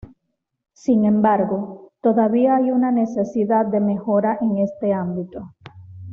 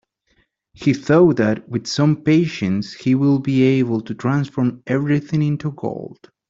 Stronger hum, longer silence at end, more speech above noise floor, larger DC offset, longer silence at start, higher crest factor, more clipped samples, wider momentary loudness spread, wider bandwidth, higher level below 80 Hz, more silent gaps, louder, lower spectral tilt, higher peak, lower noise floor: neither; second, 0 s vs 0.35 s; first, 57 dB vs 46 dB; neither; about the same, 0.9 s vs 0.8 s; about the same, 16 dB vs 16 dB; neither; first, 13 LU vs 9 LU; second, 6.8 kHz vs 7.8 kHz; about the same, -58 dBFS vs -56 dBFS; neither; about the same, -19 LUFS vs -18 LUFS; first, -9 dB/octave vs -7.5 dB/octave; about the same, -4 dBFS vs -2 dBFS; first, -76 dBFS vs -64 dBFS